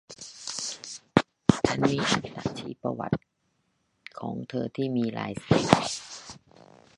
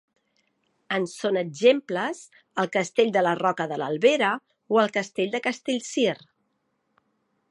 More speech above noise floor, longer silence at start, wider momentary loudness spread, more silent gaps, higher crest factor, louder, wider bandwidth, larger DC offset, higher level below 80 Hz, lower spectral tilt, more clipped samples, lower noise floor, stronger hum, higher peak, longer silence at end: second, 46 dB vs 50 dB; second, 0.1 s vs 0.9 s; first, 16 LU vs 9 LU; neither; first, 28 dB vs 20 dB; second, -28 LUFS vs -24 LUFS; about the same, 11.5 kHz vs 11.5 kHz; neither; first, -54 dBFS vs -80 dBFS; about the same, -5 dB/octave vs -4.5 dB/octave; neither; about the same, -74 dBFS vs -74 dBFS; neither; first, 0 dBFS vs -6 dBFS; second, 0.6 s vs 1.35 s